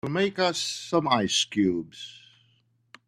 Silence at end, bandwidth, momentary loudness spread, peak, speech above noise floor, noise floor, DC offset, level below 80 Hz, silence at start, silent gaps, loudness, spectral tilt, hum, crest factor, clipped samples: 0.9 s; 13.5 kHz; 17 LU; -6 dBFS; 40 dB; -67 dBFS; under 0.1%; -64 dBFS; 0.05 s; none; -25 LUFS; -3.5 dB/octave; none; 20 dB; under 0.1%